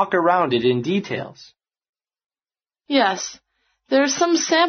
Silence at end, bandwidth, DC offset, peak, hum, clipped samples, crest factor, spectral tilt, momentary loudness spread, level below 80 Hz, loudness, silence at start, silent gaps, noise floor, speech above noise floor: 0 s; 6.6 kHz; under 0.1%; -4 dBFS; none; under 0.1%; 16 dB; -3 dB/octave; 12 LU; -66 dBFS; -20 LUFS; 0 s; 1.89-1.93 s; under -90 dBFS; over 71 dB